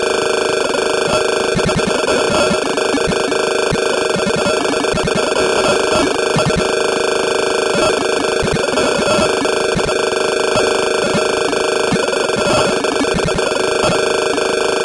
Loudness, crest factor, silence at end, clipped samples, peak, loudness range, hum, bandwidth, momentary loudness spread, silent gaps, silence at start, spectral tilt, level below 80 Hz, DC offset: -15 LUFS; 10 dB; 0 s; under 0.1%; -4 dBFS; 0 LU; none; 11.5 kHz; 2 LU; none; 0 s; -3.5 dB/octave; -38 dBFS; under 0.1%